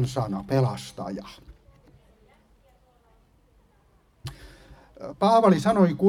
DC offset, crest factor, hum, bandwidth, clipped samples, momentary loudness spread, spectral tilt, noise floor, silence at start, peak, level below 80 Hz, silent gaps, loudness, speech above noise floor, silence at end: under 0.1%; 22 dB; none; 13.5 kHz; under 0.1%; 23 LU; -7.5 dB/octave; -61 dBFS; 0 s; -6 dBFS; -54 dBFS; none; -23 LUFS; 39 dB; 0 s